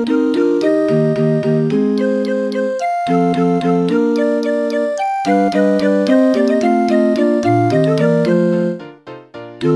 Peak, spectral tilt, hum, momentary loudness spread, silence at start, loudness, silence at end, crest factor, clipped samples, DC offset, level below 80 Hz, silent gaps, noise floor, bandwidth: 0 dBFS; -7.5 dB/octave; none; 5 LU; 0 s; -15 LUFS; 0 s; 14 dB; under 0.1%; under 0.1%; -60 dBFS; none; -35 dBFS; 11 kHz